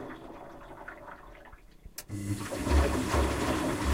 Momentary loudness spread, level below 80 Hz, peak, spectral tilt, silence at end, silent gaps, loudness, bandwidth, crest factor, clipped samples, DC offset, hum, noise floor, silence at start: 20 LU; -36 dBFS; -14 dBFS; -5.5 dB/octave; 0 s; none; -30 LUFS; 16 kHz; 18 dB; under 0.1%; under 0.1%; none; -52 dBFS; 0 s